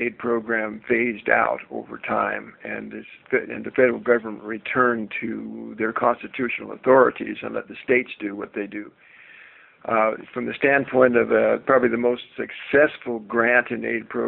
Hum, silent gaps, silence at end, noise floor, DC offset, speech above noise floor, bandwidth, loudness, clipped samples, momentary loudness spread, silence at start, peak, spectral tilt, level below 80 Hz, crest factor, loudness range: none; none; 0 s; -49 dBFS; under 0.1%; 27 dB; 4.2 kHz; -22 LUFS; under 0.1%; 14 LU; 0 s; -2 dBFS; -4 dB/octave; -64 dBFS; 20 dB; 5 LU